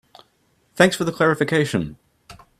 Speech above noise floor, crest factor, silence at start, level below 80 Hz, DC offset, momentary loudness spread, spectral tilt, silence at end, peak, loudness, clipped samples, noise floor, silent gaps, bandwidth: 44 dB; 22 dB; 0.75 s; -54 dBFS; under 0.1%; 8 LU; -5 dB/octave; 0.25 s; 0 dBFS; -19 LUFS; under 0.1%; -63 dBFS; none; 15 kHz